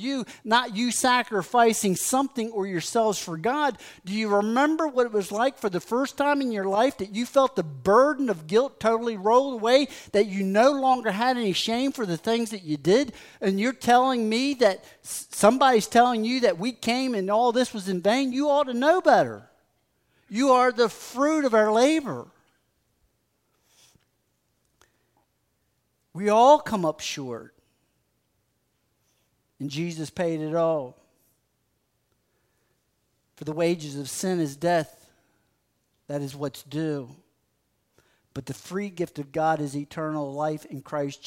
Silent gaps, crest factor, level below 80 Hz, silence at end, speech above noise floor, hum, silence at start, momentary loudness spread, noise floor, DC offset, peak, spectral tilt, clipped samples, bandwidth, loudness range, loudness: none; 22 dB; -66 dBFS; 0 s; 49 dB; none; 0 s; 13 LU; -73 dBFS; under 0.1%; -4 dBFS; -4.5 dB/octave; under 0.1%; 16 kHz; 11 LU; -24 LUFS